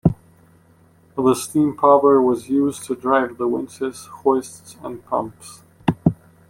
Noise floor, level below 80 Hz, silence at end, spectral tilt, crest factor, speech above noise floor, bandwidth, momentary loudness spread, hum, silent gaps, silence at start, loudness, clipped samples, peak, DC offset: -53 dBFS; -48 dBFS; 0.35 s; -6.5 dB/octave; 18 dB; 34 dB; 16.5 kHz; 20 LU; none; none; 0.05 s; -19 LUFS; under 0.1%; -2 dBFS; under 0.1%